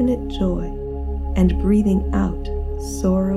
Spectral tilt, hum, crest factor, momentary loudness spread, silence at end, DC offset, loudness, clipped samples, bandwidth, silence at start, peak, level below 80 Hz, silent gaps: -7.5 dB/octave; none; 14 dB; 10 LU; 0 s; under 0.1%; -21 LUFS; under 0.1%; 13 kHz; 0 s; -4 dBFS; -26 dBFS; none